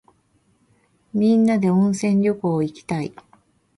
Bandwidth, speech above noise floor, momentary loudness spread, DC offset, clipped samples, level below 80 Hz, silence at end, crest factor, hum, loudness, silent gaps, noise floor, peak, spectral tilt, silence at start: 11.5 kHz; 44 dB; 11 LU; under 0.1%; under 0.1%; -62 dBFS; 0.7 s; 14 dB; none; -20 LUFS; none; -63 dBFS; -8 dBFS; -7.5 dB/octave; 1.15 s